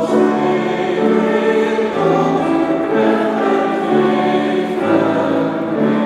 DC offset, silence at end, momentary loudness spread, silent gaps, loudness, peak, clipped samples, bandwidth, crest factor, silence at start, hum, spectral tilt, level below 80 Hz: under 0.1%; 0 s; 3 LU; none; -15 LUFS; -2 dBFS; under 0.1%; 11.5 kHz; 14 dB; 0 s; none; -7 dB/octave; -56 dBFS